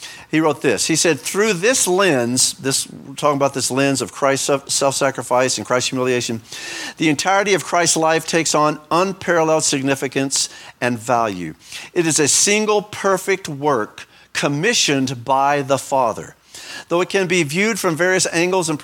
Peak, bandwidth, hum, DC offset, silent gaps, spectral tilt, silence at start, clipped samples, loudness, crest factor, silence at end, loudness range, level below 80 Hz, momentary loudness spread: 0 dBFS; 18.5 kHz; none; under 0.1%; none; -3 dB/octave; 0 s; under 0.1%; -17 LUFS; 18 dB; 0 s; 2 LU; -62 dBFS; 9 LU